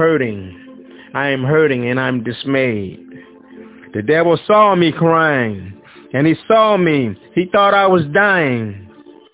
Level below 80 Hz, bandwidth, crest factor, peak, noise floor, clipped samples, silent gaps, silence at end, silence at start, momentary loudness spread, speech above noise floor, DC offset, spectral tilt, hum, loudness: -50 dBFS; 4 kHz; 16 dB; 0 dBFS; -39 dBFS; under 0.1%; none; 0.45 s; 0 s; 14 LU; 24 dB; under 0.1%; -10 dB/octave; none; -14 LUFS